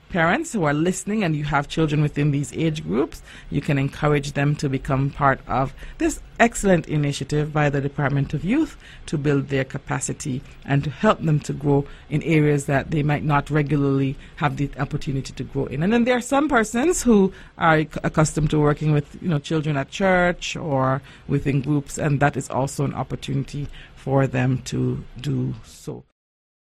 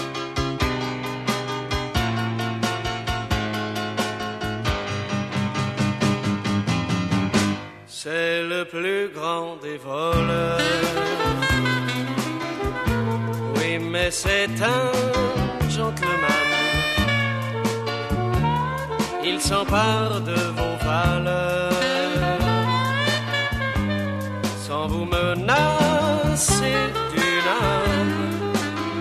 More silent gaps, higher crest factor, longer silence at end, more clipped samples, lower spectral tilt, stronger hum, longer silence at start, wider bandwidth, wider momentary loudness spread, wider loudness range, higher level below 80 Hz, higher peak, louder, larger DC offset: neither; about the same, 18 dB vs 18 dB; first, 0.75 s vs 0 s; neither; first, -6 dB/octave vs -4.5 dB/octave; neither; about the same, 0.1 s vs 0 s; about the same, 13.5 kHz vs 14 kHz; about the same, 9 LU vs 7 LU; about the same, 4 LU vs 5 LU; about the same, -40 dBFS vs -38 dBFS; about the same, -4 dBFS vs -6 dBFS; about the same, -22 LUFS vs -23 LUFS; neither